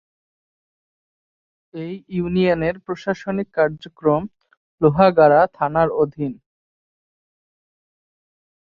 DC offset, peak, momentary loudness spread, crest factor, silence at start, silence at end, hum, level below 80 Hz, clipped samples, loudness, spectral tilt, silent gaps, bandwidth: under 0.1%; -2 dBFS; 16 LU; 20 dB; 1.75 s; 2.35 s; none; -52 dBFS; under 0.1%; -19 LUFS; -8.5 dB/octave; 4.57-4.78 s; 7 kHz